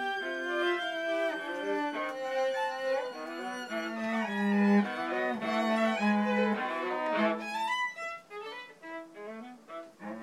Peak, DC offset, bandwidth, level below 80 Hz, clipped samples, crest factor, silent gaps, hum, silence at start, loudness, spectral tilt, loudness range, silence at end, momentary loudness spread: -16 dBFS; under 0.1%; 13.5 kHz; -88 dBFS; under 0.1%; 16 dB; none; none; 0 s; -31 LUFS; -5.5 dB/octave; 5 LU; 0 s; 16 LU